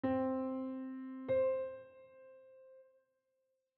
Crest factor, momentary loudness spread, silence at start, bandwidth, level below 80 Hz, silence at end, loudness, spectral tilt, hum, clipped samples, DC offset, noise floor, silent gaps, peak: 14 dB; 25 LU; 0.05 s; 4.3 kHz; -78 dBFS; 0.95 s; -38 LUFS; -7 dB/octave; none; under 0.1%; under 0.1%; -83 dBFS; none; -26 dBFS